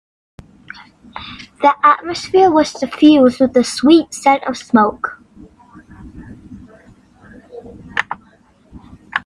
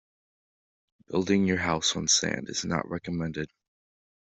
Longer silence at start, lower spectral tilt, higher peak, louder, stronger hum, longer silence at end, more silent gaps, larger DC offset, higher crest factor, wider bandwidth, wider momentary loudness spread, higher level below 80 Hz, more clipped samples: about the same, 1.15 s vs 1.1 s; first, -4.5 dB/octave vs -3 dB/octave; first, 0 dBFS vs -10 dBFS; first, -14 LUFS vs -27 LUFS; neither; second, 0.05 s vs 0.75 s; neither; neither; about the same, 16 dB vs 20 dB; first, 11.5 kHz vs 8.2 kHz; first, 25 LU vs 10 LU; first, -50 dBFS vs -60 dBFS; neither